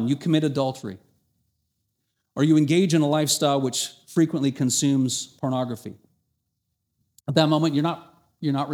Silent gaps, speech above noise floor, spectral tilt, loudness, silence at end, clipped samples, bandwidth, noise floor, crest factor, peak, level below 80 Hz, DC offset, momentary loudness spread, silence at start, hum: none; 55 dB; -5 dB/octave; -23 LUFS; 0 s; under 0.1%; 17 kHz; -77 dBFS; 20 dB; -4 dBFS; -70 dBFS; under 0.1%; 16 LU; 0 s; none